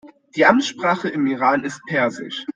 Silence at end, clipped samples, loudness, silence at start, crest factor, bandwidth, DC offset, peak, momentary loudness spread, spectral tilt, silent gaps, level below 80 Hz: 0.05 s; under 0.1%; -19 LUFS; 0.05 s; 18 dB; 9.4 kHz; under 0.1%; -2 dBFS; 8 LU; -4.5 dB/octave; none; -64 dBFS